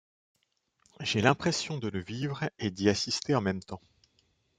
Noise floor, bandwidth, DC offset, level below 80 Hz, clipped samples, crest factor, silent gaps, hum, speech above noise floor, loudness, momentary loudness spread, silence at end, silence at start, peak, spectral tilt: -75 dBFS; 9.6 kHz; under 0.1%; -66 dBFS; under 0.1%; 24 dB; none; none; 45 dB; -30 LUFS; 11 LU; 0.8 s; 1 s; -8 dBFS; -4.5 dB/octave